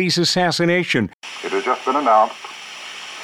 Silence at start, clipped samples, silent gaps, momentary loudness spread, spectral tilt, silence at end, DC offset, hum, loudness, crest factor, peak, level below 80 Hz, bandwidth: 0 s; under 0.1%; 1.13-1.21 s; 16 LU; -4 dB/octave; 0 s; under 0.1%; none; -18 LUFS; 16 dB; -4 dBFS; -60 dBFS; 15 kHz